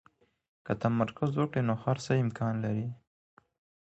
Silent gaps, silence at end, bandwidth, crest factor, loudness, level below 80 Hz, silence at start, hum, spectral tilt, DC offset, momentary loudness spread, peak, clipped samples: none; 0.85 s; 8.2 kHz; 18 dB; -31 LUFS; -64 dBFS; 0.65 s; none; -7.5 dB/octave; under 0.1%; 9 LU; -14 dBFS; under 0.1%